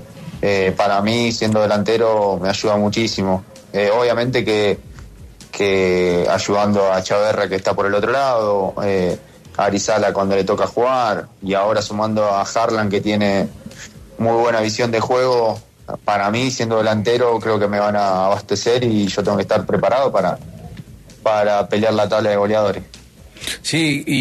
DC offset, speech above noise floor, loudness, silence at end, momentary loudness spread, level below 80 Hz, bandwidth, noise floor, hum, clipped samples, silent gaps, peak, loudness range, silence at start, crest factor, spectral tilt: under 0.1%; 22 dB; -17 LUFS; 0 s; 8 LU; -48 dBFS; 13.5 kHz; -39 dBFS; none; under 0.1%; none; -4 dBFS; 2 LU; 0 s; 14 dB; -5 dB/octave